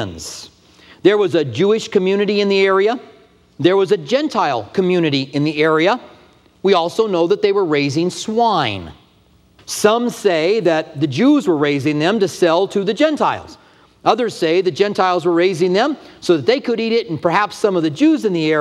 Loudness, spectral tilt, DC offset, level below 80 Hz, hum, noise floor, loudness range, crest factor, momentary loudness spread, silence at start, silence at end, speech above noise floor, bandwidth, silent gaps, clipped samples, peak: -16 LUFS; -5.5 dB/octave; under 0.1%; -58 dBFS; none; -52 dBFS; 2 LU; 16 dB; 5 LU; 0 s; 0 s; 37 dB; 13.5 kHz; none; under 0.1%; 0 dBFS